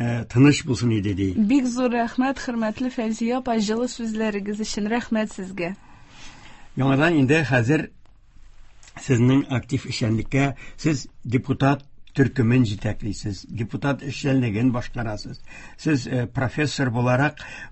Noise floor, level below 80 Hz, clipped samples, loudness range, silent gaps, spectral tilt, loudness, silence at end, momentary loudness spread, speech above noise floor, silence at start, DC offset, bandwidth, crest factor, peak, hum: -46 dBFS; -46 dBFS; under 0.1%; 4 LU; none; -6.5 dB/octave; -23 LUFS; 0 s; 12 LU; 24 dB; 0 s; under 0.1%; 8.6 kHz; 18 dB; -4 dBFS; none